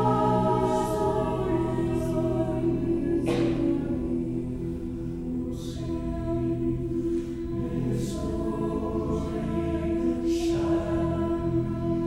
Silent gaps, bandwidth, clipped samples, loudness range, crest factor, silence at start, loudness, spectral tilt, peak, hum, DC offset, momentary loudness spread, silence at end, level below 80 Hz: none; 13 kHz; under 0.1%; 4 LU; 16 dB; 0 s; -28 LUFS; -8 dB/octave; -12 dBFS; none; under 0.1%; 7 LU; 0 s; -40 dBFS